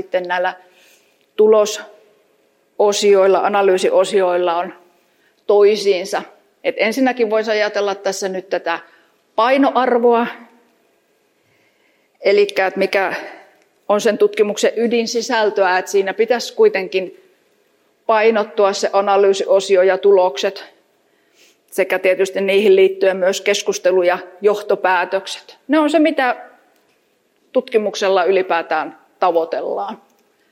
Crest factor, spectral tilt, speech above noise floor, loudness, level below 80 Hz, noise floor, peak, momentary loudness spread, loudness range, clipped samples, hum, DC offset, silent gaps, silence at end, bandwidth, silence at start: 14 dB; -3.5 dB/octave; 45 dB; -16 LUFS; -78 dBFS; -61 dBFS; -2 dBFS; 11 LU; 4 LU; under 0.1%; none; under 0.1%; none; 0.55 s; 16 kHz; 0 s